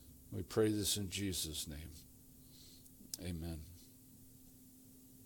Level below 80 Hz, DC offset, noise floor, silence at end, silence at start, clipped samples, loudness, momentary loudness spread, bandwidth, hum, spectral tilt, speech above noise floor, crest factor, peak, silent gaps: -62 dBFS; under 0.1%; -61 dBFS; 0 s; 0 s; under 0.1%; -40 LUFS; 24 LU; 18 kHz; none; -4 dB/octave; 21 dB; 22 dB; -22 dBFS; none